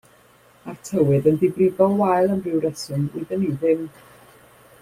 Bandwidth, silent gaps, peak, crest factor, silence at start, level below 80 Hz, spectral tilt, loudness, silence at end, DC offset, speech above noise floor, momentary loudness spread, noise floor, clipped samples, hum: 15.5 kHz; none; -4 dBFS; 18 dB; 0.65 s; -58 dBFS; -7.5 dB/octave; -21 LUFS; 0.95 s; under 0.1%; 33 dB; 14 LU; -53 dBFS; under 0.1%; none